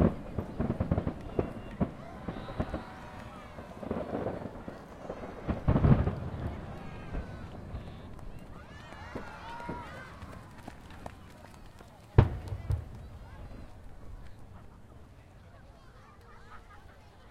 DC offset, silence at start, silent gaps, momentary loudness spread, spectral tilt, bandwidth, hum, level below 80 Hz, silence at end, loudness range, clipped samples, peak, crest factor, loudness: under 0.1%; 0 s; none; 25 LU; -9 dB/octave; 11.5 kHz; none; -44 dBFS; 0 s; 18 LU; under 0.1%; -6 dBFS; 30 dB; -35 LUFS